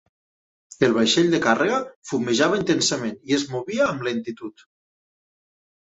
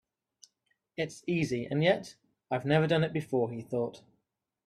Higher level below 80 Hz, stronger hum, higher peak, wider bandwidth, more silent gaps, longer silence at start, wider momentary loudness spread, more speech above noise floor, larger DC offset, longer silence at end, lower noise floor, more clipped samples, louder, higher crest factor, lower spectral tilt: first, -62 dBFS vs -68 dBFS; neither; first, -4 dBFS vs -12 dBFS; second, 8.2 kHz vs 12 kHz; first, 1.96-2.02 s vs none; second, 0.8 s vs 1 s; about the same, 11 LU vs 10 LU; first, over 68 dB vs 52 dB; neither; first, 1.45 s vs 0.7 s; first, under -90 dBFS vs -82 dBFS; neither; first, -21 LUFS vs -31 LUFS; about the same, 20 dB vs 20 dB; second, -4 dB/octave vs -6.5 dB/octave